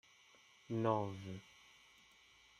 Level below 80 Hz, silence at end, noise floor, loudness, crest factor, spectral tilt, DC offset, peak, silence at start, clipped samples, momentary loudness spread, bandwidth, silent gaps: -80 dBFS; 1.15 s; -67 dBFS; -41 LUFS; 24 dB; -7 dB/octave; under 0.1%; -22 dBFS; 0.7 s; under 0.1%; 27 LU; 13 kHz; none